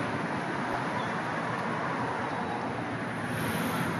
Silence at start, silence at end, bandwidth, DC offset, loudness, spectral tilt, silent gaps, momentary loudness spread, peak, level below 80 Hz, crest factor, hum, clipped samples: 0 s; 0 s; 13 kHz; under 0.1%; -32 LUFS; -5.5 dB/octave; none; 3 LU; -20 dBFS; -64 dBFS; 12 dB; none; under 0.1%